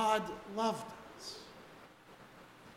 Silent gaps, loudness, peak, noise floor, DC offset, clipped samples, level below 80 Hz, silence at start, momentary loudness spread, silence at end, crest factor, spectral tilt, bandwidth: none; -39 LUFS; -18 dBFS; -58 dBFS; under 0.1%; under 0.1%; -70 dBFS; 0 s; 21 LU; 0 s; 20 dB; -4 dB/octave; 16 kHz